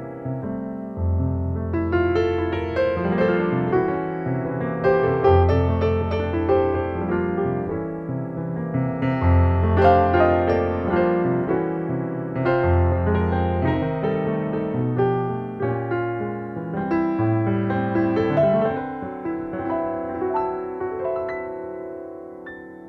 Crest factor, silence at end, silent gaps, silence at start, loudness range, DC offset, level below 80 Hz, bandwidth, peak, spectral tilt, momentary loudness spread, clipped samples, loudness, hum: 18 dB; 0 s; none; 0 s; 5 LU; under 0.1%; -38 dBFS; 5.8 kHz; -4 dBFS; -10 dB/octave; 11 LU; under 0.1%; -22 LUFS; none